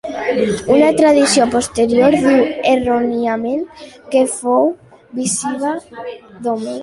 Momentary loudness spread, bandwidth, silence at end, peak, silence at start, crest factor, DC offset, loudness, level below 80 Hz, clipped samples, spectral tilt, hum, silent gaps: 14 LU; 11.5 kHz; 0 s; -2 dBFS; 0.05 s; 14 dB; under 0.1%; -15 LUFS; -48 dBFS; under 0.1%; -4 dB/octave; none; none